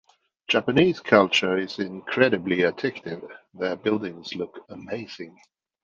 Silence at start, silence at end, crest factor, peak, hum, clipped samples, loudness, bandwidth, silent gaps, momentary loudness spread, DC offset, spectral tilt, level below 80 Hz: 0.5 s; 0.55 s; 22 dB; -2 dBFS; none; under 0.1%; -23 LUFS; 7.4 kHz; none; 19 LU; under 0.1%; -5.5 dB/octave; -64 dBFS